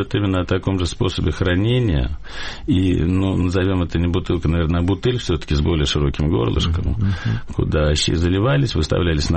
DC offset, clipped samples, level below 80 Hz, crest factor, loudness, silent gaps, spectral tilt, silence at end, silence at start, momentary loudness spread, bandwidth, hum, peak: under 0.1%; under 0.1%; -28 dBFS; 10 dB; -19 LUFS; none; -6 dB/octave; 0 s; 0 s; 4 LU; 8.8 kHz; none; -8 dBFS